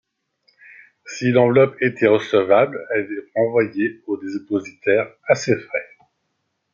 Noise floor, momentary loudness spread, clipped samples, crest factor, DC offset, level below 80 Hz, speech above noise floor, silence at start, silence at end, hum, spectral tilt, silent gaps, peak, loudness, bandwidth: -73 dBFS; 11 LU; under 0.1%; 18 dB; under 0.1%; -68 dBFS; 54 dB; 1.05 s; 0.9 s; none; -6 dB/octave; none; -2 dBFS; -19 LUFS; 7.6 kHz